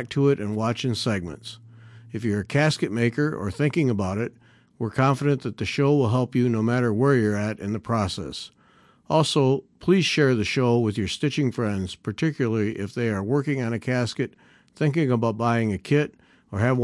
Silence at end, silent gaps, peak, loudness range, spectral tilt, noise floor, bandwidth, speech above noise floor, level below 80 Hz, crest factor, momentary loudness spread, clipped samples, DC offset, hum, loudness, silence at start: 0 s; none; -6 dBFS; 3 LU; -6.5 dB/octave; -57 dBFS; 12 kHz; 34 dB; -60 dBFS; 16 dB; 10 LU; under 0.1%; under 0.1%; none; -24 LUFS; 0 s